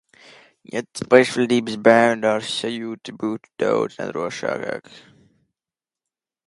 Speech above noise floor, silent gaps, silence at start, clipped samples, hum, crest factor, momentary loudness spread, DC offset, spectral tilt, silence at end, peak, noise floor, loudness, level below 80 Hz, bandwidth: over 70 dB; none; 0.75 s; under 0.1%; none; 22 dB; 15 LU; under 0.1%; -4.5 dB/octave; 1.5 s; 0 dBFS; under -90 dBFS; -20 LUFS; -66 dBFS; 11.5 kHz